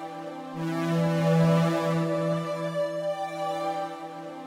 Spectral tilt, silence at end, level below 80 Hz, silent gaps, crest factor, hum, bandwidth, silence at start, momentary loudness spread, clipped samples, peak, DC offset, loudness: -7 dB/octave; 0 s; -66 dBFS; none; 16 dB; none; 13.5 kHz; 0 s; 14 LU; under 0.1%; -12 dBFS; under 0.1%; -27 LUFS